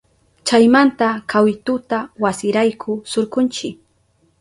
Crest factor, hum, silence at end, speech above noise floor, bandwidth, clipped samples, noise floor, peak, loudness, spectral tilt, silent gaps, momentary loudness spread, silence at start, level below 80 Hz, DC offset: 16 dB; none; 0.65 s; 44 dB; 11.5 kHz; under 0.1%; -60 dBFS; -2 dBFS; -17 LUFS; -4.5 dB/octave; none; 13 LU; 0.45 s; -58 dBFS; under 0.1%